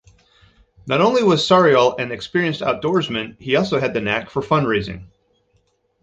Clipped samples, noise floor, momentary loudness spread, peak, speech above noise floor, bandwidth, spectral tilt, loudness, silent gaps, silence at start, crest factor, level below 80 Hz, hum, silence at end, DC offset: under 0.1%; -64 dBFS; 12 LU; -2 dBFS; 46 dB; 8.2 kHz; -5.5 dB/octave; -18 LUFS; none; 0.85 s; 18 dB; -50 dBFS; none; 1 s; under 0.1%